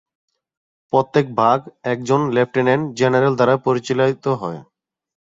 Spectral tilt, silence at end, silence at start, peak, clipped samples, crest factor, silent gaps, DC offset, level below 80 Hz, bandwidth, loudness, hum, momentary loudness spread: -6.5 dB/octave; 0.8 s; 0.95 s; -2 dBFS; under 0.1%; 18 dB; none; under 0.1%; -60 dBFS; 7.8 kHz; -18 LUFS; none; 8 LU